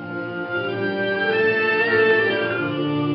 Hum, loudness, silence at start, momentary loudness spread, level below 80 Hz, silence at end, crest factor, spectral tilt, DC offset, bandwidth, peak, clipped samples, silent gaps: none; -20 LUFS; 0 s; 9 LU; -70 dBFS; 0 s; 14 dB; -3 dB/octave; under 0.1%; 5.6 kHz; -6 dBFS; under 0.1%; none